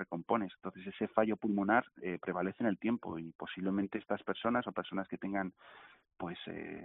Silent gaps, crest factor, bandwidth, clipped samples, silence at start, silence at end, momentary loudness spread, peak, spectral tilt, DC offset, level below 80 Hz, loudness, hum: 3.35-3.39 s; 24 dB; 4 kHz; under 0.1%; 0 s; 0 s; 12 LU; -14 dBFS; -5 dB/octave; under 0.1%; -72 dBFS; -37 LUFS; none